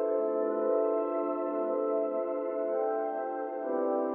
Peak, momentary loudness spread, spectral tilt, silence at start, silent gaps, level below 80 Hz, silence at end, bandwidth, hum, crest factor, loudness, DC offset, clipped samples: -18 dBFS; 5 LU; -6 dB/octave; 0 s; none; -82 dBFS; 0 s; 3.3 kHz; none; 14 dB; -31 LUFS; under 0.1%; under 0.1%